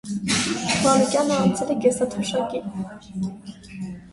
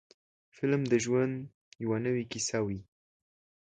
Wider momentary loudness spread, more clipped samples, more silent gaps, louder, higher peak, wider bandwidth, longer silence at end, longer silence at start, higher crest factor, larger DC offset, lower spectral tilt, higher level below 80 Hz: first, 17 LU vs 13 LU; neither; second, none vs 1.54-1.71 s; first, -22 LUFS vs -31 LUFS; first, -4 dBFS vs -14 dBFS; first, 11.5 kHz vs 9.6 kHz; second, 0 s vs 0.8 s; second, 0.05 s vs 0.6 s; about the same, 18 dB vs 18 dB; neither; about the same, -4 dB/octave vs -5 dB/octave; first, -54 dBFS vs -64 dBFS